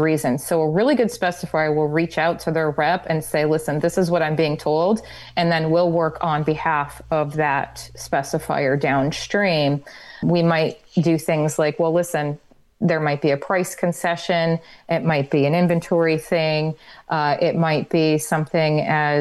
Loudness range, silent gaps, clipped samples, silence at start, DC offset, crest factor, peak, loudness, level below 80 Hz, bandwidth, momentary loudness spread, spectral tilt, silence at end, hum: 2 LU; none; under 0.1%; 0 s; under 0.1%; 14 dB; -6 dBFS; -20 LUFS; -52 dBFS; 12.5 kHz; 6 LU; -6 dB/octave; 0 s; none